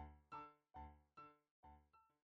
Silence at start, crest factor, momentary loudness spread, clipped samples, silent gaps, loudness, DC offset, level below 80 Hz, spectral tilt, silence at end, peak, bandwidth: 0 s; 18 dB; 11 LU; under 0.1%; 1.51-1.63 s; -61 LUFS; under 0.1%; -70 dBFS; -5.5 dB/octave; 0.3 s; -44 dBFS; 7 kHz